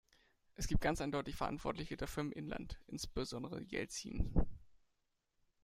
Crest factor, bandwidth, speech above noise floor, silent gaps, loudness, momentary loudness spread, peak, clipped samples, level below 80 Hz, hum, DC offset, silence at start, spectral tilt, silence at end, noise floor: 24 dB; 15.5 kHz; 44 dB; none; -42 LUFS; 9 LU; -18 dBFS; under 0.1%; -46 dBFS; none; under 0.1%; 0.6 s; -5 dB/octave; 0.9 s; -83 dBFS